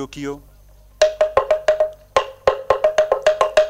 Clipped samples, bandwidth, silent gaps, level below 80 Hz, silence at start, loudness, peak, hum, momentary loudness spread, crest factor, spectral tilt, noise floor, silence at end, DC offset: under 0.1%; 12.5 kHz; none; -46 dBFS; 0 s; -18 LUFS; -2 dBFS; none; 12 LU; 18 dB; -3 dB/octave; -47 dBFS; 0 s; under 0.1%